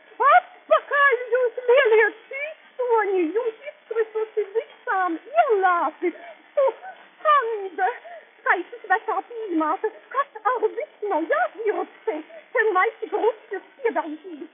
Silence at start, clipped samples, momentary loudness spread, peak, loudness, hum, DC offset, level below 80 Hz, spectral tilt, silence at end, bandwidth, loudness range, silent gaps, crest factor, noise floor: 0.2 s; under 0.1%; 13 LU; -6 dBFS; -23 LUFS; none; under 0.1%; under -90 dBFS; 2 dB/octave; 0.1 s; 3.7 kHz; 5 LU; none; 18 dB; -43 dBFS